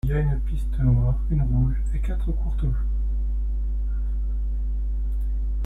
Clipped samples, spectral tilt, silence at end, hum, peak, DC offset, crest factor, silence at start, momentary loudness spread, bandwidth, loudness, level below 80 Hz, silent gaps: under 0.1%; -10 dB/octave; 0 s; none; -10 dBFS; under 0.1%; 14 dB; 0.05 s; 7 LU; 3.7 kHz; -26 LUFS; -24 dBFS; none